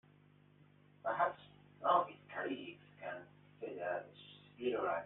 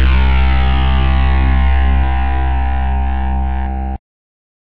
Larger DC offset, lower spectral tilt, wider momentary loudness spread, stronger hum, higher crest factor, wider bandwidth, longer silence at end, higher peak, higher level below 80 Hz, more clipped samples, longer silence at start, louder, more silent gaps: second, under 0.1% vs 10%; second, -3 dB/octave vs -9 dB/octave; first, 20 LU vs 7 LU; first, 50 Hz at -65 dBFS vs none; first, 22 dB vs 8 dB; about the same, 4 kHz vs 4.4 kHz; second, 0 s vs 0.8 s; second, -20 dBFS vs -4 dBFS; second, -82 dBFS vs -14 dBFS; neither; first, 1.05 s vs 0 s; second, -40 LUFS vs -16 LUFS; neither